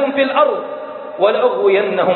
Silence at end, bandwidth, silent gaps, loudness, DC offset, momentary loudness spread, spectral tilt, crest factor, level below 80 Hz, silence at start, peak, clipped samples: 0 s; 4.3 kHz; none; -15 LUFS; under 0.1%; 13 LU; -10 dB/octave; 14 dB; -66 dBFS; 0 s; -2 dBFS; under 0.1%